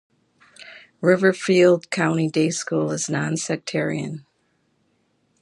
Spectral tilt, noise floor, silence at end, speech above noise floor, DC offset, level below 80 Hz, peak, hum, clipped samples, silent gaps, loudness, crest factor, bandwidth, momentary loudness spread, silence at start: -5 dB/octave; -67 dBFS; 1.2 s; 47 dB; under 0.1%; -68 dBFS; -4 dBFS; none; under 0.1%; none; -21 LUFS; 20 dB; 11.5 kHz; 18 LU; 0.6 s